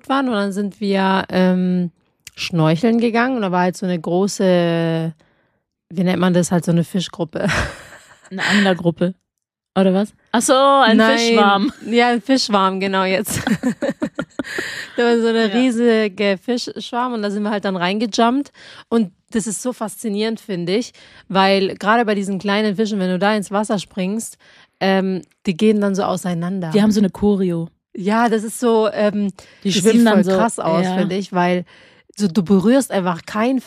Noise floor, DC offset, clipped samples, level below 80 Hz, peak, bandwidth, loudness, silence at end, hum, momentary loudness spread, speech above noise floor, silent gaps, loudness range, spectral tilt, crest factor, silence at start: -80 dBFS; under 0.1%; under 0.1%; -50 dBFS; 0 dBFS; 15 kHz; -18 LUFS; 0.05 s; none; 10 LU; 63 dB; none; 5 LU; -5.5 dB/octave; 16 dB; 0.1 s